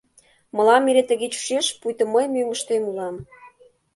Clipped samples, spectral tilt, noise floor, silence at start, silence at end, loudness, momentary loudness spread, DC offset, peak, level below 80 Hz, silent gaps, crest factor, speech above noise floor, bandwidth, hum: under 0.1%; -2.5 dB/octave; -58 dBFS; 0.55 s; 0.5 s; -21 LUFS; 14 LU; under 0.1%; -4 dBFS; -64 dBFS; none; 18 dB; 37 dB; 11.5 kHz; none